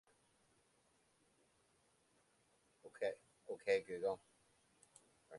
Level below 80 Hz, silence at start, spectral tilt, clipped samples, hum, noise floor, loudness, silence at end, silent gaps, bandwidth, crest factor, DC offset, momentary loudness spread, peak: -86 dBFS; 2.85 s; -4 dB/octave; under 0.1%; none; -77 dBFS; -43 LUFS; 0 s; none; 11.5 kHz; 24 dB; under 0.1%; 16 LU; -24 dBFS